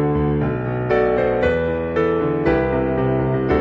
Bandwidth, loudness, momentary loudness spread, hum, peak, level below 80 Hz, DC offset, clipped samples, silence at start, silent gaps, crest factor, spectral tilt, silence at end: 6.6 kHz; -19 LUFS; 3 LU; none; -6 dBFS; -34 dBFS; under 0.1%; under 0.1%; 0 s; none; 12 dB; -9.5 dB/octave; 0 s